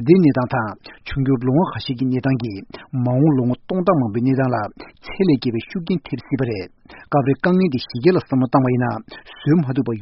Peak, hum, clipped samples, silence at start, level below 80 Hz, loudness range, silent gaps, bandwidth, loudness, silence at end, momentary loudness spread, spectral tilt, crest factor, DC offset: 0 dBFS; none; under 0.1%; 0 s; -48 dBFS; 2 LU; none; 5.8 kHz; -19 LUFS; 0 s; 12 LU; -7 dB/octave; 18 dB; under 0.1%